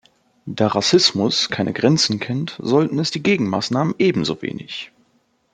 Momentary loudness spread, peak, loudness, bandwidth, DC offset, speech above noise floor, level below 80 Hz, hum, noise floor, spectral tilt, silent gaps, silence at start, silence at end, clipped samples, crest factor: 15 LU; -2 dBFS; -18 LUFS; 9.4 kHz; under 0.1%; 44 dB; -60 dBFS; none; -63 dBFS; -4.5 dB/octave; none; 0.45 s; 0.7 s; under 0.1%; 18 dB